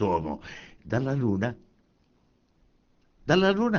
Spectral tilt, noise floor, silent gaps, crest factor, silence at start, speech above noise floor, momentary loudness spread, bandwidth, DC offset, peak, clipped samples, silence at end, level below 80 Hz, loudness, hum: -5 dB/octave; -66 dBFS; none; 22 dB; 0 s; 40 dB; 21 LU; 7 kHz; under 0.1%; -6 dBFS; under 0.1%; 0 s; -54 dBFS; -27 LUFS; none